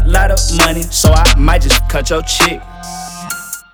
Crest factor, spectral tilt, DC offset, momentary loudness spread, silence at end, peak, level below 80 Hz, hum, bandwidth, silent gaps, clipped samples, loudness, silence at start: 12 dB; -3.5 dB/octave; under 0.1%; 16 LU; 0.15 s; 0 dBFS; -14 dBFS; none; over 20 kHz; none; under 0.1%; -12 LUFS; 0 s